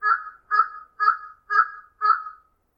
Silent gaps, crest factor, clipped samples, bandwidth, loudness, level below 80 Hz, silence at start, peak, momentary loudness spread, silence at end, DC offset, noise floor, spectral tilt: none; 18 dB; under 0.1%; 6.6 kHz; -23 LUFS; -72 dBFS; 0 s; -6 dBFS; 6 LU; 0.45 s; under 0.1%; -46 dBFS; -0.5 dB/octave